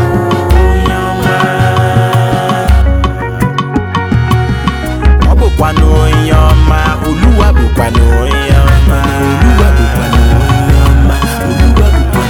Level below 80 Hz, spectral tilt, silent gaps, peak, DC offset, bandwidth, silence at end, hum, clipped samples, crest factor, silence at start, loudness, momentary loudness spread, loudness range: -10 dBFS; -6.5 dB/octave; none; 0 dBFS; under 0.1%; 16 kHz; 0 s; none; 1%; 8 dB; 0 s; -9 LUFS; 5 LU; 2 LU